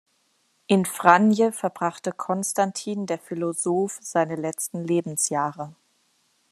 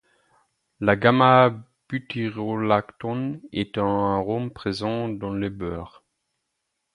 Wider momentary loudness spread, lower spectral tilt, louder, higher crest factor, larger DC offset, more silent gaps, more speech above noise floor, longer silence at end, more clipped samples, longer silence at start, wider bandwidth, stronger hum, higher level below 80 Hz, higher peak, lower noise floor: second, 12 LU vs 16 LU; second, -4.5 dB/octave vs -7.5 dB/octave; about the same, -24 LUFS vs -23 LUFS; about the same, 24 dB vs 22 dB; neither; neither; second, 44 dB vs 56 dB; second, 0.8 s vs 1.05 s; neither; about the same, 0.7 s vs 0.8 s; first, 14 kHz vs 11 kHz; neither; second, -72 dBFS vs -52 dBFS; about the same, 0 dBFS vs -2 dBFS; second, -68 dBFS vs -78 dBFS